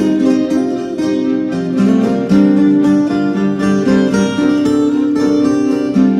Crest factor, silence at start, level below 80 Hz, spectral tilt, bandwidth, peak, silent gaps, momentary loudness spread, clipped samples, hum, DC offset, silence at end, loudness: 10 dB; 0 s; -46 dBFS; -7 dB/octave; 10 kHz; -2 dBFS; none; 6 LU; under 0.1%; none; under 0.1%; 0 s; -13 LUFS